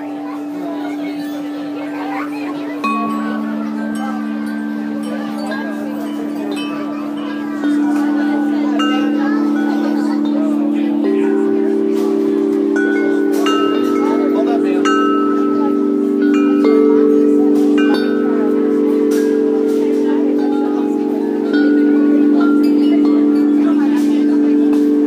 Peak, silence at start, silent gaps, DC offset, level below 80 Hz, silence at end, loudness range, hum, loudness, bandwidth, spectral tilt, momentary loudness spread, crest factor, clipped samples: 0 dBFS; 0 s; none; under 0.1%; -68 dBFS; 0 s; 8 LU; none; -15 LUFS; 14 kHz; -6 dB/octave; 10 LU; 14 dB; under 0.1%